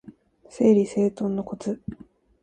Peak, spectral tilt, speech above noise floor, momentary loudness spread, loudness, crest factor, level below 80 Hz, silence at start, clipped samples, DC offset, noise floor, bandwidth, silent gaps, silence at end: -6 dBFS; -8 dB/octave; 27 dB; 14 LU; -24 LUFS; 18 dB; -58 dBFS; 0.55 s; under 0.1%; under 0.1%; -49 dBFS; 9.8 kHz; none; 0.5 s